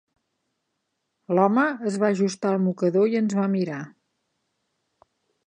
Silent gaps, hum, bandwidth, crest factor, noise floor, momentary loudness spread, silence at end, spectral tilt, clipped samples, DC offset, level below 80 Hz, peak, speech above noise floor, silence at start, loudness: none; none; 9.8 kHz; 20 dB; -78 dBFS; 7 LU; 1.55 s; -7 dB/octave; under 0.1%; under 0.1%; -78 dBFS; -6 dBFS; 56 dB; 1.3 s; -23 LUFS